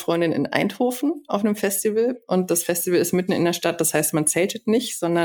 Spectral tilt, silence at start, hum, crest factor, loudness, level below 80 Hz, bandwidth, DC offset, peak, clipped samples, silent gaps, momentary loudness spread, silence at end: -4 dB/octave; 0 s; none; 18 dB; -21 LUFS; -64 dBFS; 19 kHz; under 0.1%; -2 dBFS; under 0.1%; none; 4 LU; 0 s